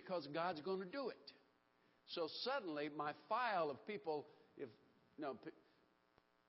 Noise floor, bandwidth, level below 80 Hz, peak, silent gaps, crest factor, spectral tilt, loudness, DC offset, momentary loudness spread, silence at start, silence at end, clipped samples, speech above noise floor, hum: -77 dBFS; 5.6 kHz; under -90 dBFS; -28 dBFS; none; 20 dB; -2.5 dB/octave; -46 LUFS; under 0.1%; 15 LU; 0 s; 1 s; under 0.1%; 32 dB; none